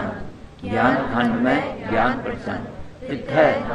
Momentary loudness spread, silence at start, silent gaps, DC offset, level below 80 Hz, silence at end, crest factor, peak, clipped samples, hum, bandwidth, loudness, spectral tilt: 17 LU; 0 s; none; under 0.1%; -42 dBFS; 0 s; 18 dB; -4 dBFS; under 0.1%; none; 9.4 kHz; -21 LUFS; -7 dB/octave